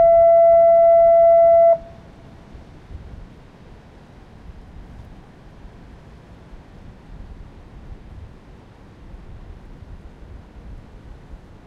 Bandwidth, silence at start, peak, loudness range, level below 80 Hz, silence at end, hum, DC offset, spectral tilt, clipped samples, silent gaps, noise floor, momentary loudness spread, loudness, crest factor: 3.6 kHz; 0 s; -6 dBFS; 28 LU; -42 dBFS; 0.3 s; none; under 0.1%; -8 dB/octave; under 0.1%; none; -44 dBFS; 12 LU; -12 LUFS; 12 dB